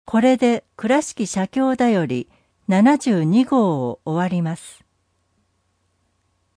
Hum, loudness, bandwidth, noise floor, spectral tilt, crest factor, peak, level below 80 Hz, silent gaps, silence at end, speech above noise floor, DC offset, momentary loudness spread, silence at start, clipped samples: none; -19 LUFS; 10.5 kHz; -67 dBFS; -6.5 dB/octave; 16 dB; -4 dBFS; -60 dBFS; none; 1.85 s; 49 dB; under 0.1%; 10 LU; 0.1 s; under 0.1%